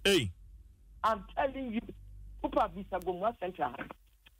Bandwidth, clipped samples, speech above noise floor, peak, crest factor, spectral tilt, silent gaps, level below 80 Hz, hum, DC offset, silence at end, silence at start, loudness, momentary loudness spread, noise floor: 16 kHz; under 0.1%; 22 dB; -16 dBFS; 18 dB; -4 dB/octave; none; -52 dBFS; none; under 0.1%; 0.5 s; 0 s; -34 LUFS; 17 LU; -55 dBFS